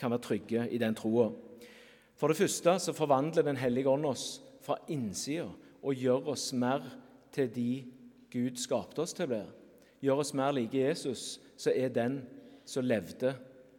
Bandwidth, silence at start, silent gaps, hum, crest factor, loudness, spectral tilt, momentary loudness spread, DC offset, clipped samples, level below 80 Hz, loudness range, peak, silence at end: 18 kHz; 0 s; none; none; 20 dB; -33 LUFS; -5 dB/octave; 12 LU; under 0.1%; under 0.1%; -76 dBFS; 4 LU; -14 dBFS; 0.15 s